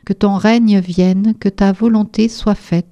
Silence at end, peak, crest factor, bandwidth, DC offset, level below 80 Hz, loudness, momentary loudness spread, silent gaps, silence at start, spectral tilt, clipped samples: 0.1 s; 0 dBFS; 14 dB; 8.6 kHz; under 0.1%; -38 dBFS; -14 LUFS; 4 LU; none; 0.1 s; -7.5 dB/octave; under 0.1%